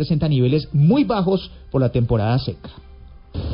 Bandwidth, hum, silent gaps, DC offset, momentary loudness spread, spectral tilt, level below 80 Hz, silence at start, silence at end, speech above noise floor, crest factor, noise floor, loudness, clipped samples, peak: 5.4 kHz; none; none; under 0.1%; 14 LU; -13 dB/octave; -36 dBFS; 0 s; 0 s; 23 dB; 14 dB; -41 dBFS; -19 LUFS; under 0.1%; -6 dBFS